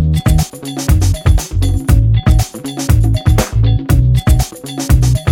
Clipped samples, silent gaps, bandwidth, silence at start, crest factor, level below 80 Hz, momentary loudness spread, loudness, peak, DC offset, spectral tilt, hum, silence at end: under 0.1%; none; 17 kHz; 0 s; 12 dB; -16 dBFS; 9 LU; -13 LUFS; 0 dBFS; under 0.1%; -6 dB/octave; none; 0 s